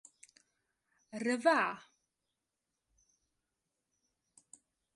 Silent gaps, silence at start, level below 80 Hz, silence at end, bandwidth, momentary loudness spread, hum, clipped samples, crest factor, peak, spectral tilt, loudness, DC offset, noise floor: none; 1.15 s; -88 dBFS; 3.15 s; 11.5 kHz; 20 LU; none; under 0.1%; 26 dB; -16 dBFS; -3.5 dB/octave; -32 LUFS; under 0.1%; -88 dBFS